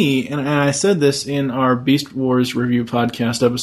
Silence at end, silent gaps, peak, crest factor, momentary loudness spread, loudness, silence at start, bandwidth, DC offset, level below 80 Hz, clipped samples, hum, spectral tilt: 0 s; none; -4 dBFS; 14 dB; 4 LU; -18 LUFS; 0 s; 13.5 kHz; under 0.1%; -56 dBFS; under 0.1%; none; -5 dB/octave